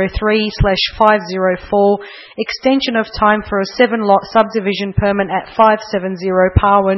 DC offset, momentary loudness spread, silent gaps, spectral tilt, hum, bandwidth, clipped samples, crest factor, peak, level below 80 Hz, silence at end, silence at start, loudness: under 0.1%; 7 LU; none; -7 dB/octave; none; 6 kHz; under 0.1%; 14 dB; 0 dBFS; -30 dBFS; 0 s; 0 s; -14 LUFS